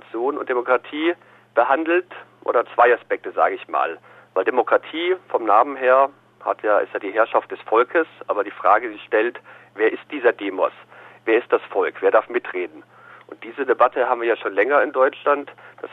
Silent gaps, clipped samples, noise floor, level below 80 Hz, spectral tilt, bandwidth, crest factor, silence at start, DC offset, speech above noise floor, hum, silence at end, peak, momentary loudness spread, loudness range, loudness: none; under 0.1%; -43 dBFS; -74 dBFS; -6 dB/octave; 4.1 kHz; 18 dB; 0.15 s; under 0.1%; 22 dB; none; 0.05 s; -2 dBFS; 11 LU; 2 LU; -20 LUFS